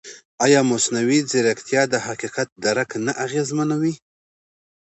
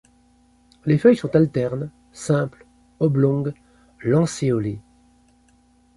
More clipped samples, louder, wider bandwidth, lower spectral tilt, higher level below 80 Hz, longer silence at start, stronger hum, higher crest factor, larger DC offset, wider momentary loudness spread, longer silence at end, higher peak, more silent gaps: neither; about the same, -20 LUFS vs -21 LUFS; second, 8.2 kHz vs 11.5 kHz; second, -4 dB/octave vs -7.5 dB/octave; second, -68 dBFS vs -54 dBFS; second, 0.05 s vs 0.85 s; neither; about the same, 18 dB vs 20 dB; neither; second, 10 LU vs 15 LU; second, 0.9 s vs 1.15 s; about the same, -2 dBFS vs -2 dBFS; first, 0.25-0.38 s, 2.52-2.56 s vs none